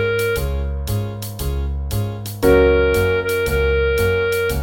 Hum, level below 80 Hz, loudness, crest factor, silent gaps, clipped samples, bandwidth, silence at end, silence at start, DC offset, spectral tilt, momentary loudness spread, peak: none; -26 dBFS; -19 LUFS; 16 dB; none; under 0.1%; 17 kHz; 0 s; 0 s; under 0.1%; -6 dB/octave; 10 LU; -2 dBFS